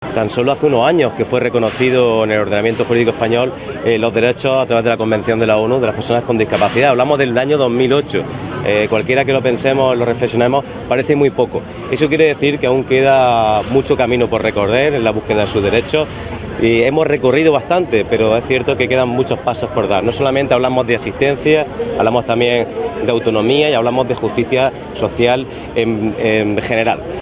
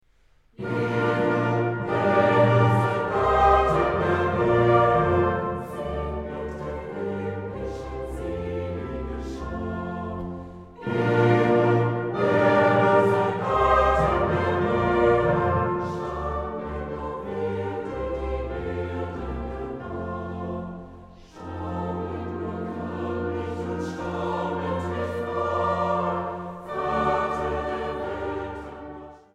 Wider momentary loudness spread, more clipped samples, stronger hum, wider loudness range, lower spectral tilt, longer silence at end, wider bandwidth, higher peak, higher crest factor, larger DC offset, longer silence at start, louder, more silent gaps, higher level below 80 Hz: second, 6 LU vs 14 LU; neither; neither; second, 2 LU vs 11 LU; first, -10 dB/octave vs -8 dB/octave; second, 0 s vs 0.15 s; second, 4 kHz vs 10.5 kHz; first, 0 dBFS vs -6 dBFS; about the same, 14 dB vs 18 dB; neither; second, 0 s vs 0.6 s; first, -14 LUFS vs -25 LUFS; neither; about the same, -40 dBFS vs -40 dBFS